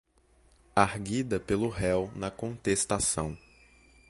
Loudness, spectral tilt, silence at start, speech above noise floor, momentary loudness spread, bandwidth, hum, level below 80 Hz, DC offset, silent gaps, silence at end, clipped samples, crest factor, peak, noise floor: -30 LUFS; -4.5 dB/octave; 0.75 s; 34 dB; 9 LU; 12 kHz; none; -50 dBFS; under 0.1%; none; 0.7 s; under 0.1%; 26 dB; -6 dBFS; -64 dBFS